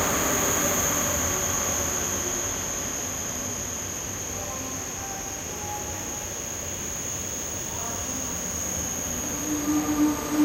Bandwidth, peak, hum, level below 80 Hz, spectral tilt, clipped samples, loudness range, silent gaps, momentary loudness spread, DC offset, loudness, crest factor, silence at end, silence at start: 16 kHz; -12 dBFS; none; -46 dBFS; -2.5 dB/octave; under 0.1%; 6 LU; none; 8 LU; under 0.1%; -26 LUFS; 16 dB; 0 s; 0 s